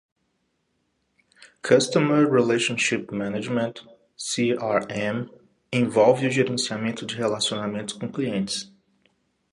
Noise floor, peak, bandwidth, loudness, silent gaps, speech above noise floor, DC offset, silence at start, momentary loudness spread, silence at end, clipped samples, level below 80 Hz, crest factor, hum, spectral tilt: -73 dBFS; -4 dBFS; 11.5 kHz; -23 LUFS; none; 50 dB; under 0.1%; 1.4 s; 12 LU; 0.85 s; under 0.1%; -66 dBFS; 20 dB; none; -4.5 dB/octave